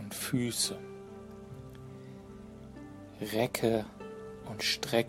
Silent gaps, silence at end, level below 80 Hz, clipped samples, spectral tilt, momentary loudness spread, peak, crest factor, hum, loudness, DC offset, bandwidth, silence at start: none; 0 s; -60 dBFS; under 0.1%; -3.5 dB/octave; 19 LU; -14 dBFS; 22 dB; none; -33 LUFS; under 0.1%; 16 kHz; 0 s